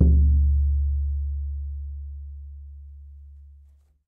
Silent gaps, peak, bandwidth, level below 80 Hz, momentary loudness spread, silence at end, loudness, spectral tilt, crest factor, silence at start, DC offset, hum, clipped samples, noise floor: none; -4 dBFS; 0.7 kHz; -24 dBFS; 25 LU; 0.65 s; -24 LUFS; -14.5 dB/octave; 18 dB; 0 s; under 0.1%; none; under 0.1%; -54 dBFS